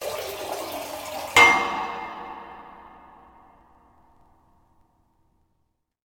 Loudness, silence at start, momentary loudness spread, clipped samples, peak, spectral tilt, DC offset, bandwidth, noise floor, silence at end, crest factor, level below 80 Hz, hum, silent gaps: -21 LUFS; 0 s; 25 LU; under 0.1%; -2 dBFS; -1.5 dB/octave; under 0.1%; over 20 kHz; -73 dBFS; 3.05 s; 26 dB; -58 dBFS; none; none